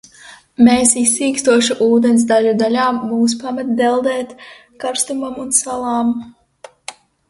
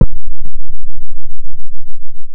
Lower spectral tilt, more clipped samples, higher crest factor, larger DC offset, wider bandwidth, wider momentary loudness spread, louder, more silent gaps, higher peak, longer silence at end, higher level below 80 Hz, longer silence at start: second, -3 dB/octave vs -13.5 dB/octave; second, under 0.1% vs 0.7%; first, 16 dB vs 2 dB; neither; first, 12 kHz vs 1 kHz; first, 14 LU vs 11 LU; first, -15 LUFS vs -29 LUFS; neither; about the same, 0 dBFS vs 0 dBFS; first, 0.35 s vs 0 s; second, -54 dBFS vs -18 dBFS; first, 0.25 s vs 0 s